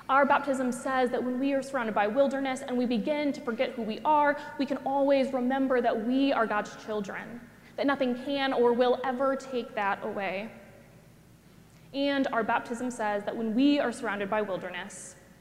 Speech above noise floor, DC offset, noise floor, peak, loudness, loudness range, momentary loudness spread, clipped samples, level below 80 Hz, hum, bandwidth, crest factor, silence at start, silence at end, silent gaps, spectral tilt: 27 dB; under 0.1%; -55 dBFS; -10 dBFS; -28 LUFS; 5 LU; 10 LU; under 0.1%; -66 dBFS; none; 14.5 kHz; 18 dB; 0.1 s; 0.25 s; none; -5 dB/octave